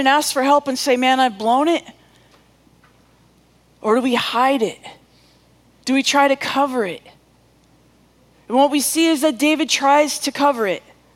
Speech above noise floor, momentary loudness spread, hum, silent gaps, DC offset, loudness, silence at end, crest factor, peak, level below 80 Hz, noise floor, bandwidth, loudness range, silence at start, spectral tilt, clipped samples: 38 dB; 9 LU; none; none; under 0.1%; -17 LUFS; 0.35 s; 20 dB; 0 dBFS; -64 dBFS; -55 dBFS; 17 kHz; 5 LU; 0 s; -2 dB/octave; under 0.1%